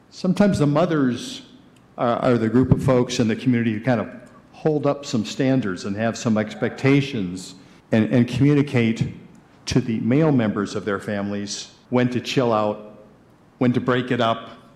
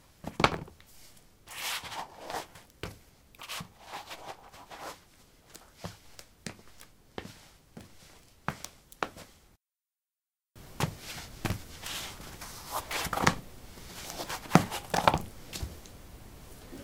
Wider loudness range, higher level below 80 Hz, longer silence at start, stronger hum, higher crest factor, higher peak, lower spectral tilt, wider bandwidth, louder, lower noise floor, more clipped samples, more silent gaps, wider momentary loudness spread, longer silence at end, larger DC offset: second, 3 LU vs 16 LU; about the same, -50 dBFS vs -54 dBFS; about the same, 0.15 s vs 0.25 s; neither; second, 18 dB vs 36 dB; second, -4 dBFS vs 0 dBFS; first, -6.5 dB/octave vs -4 dB/octave; second, 12 kHz vs 18 kHz; first, -21 LUFS vs -34 LUFS; second, -52 dBFS vs under -90 dBFS; neither; neither; second, 11 LU vs 25 LU; first, 0.2 s vs 0 s; neither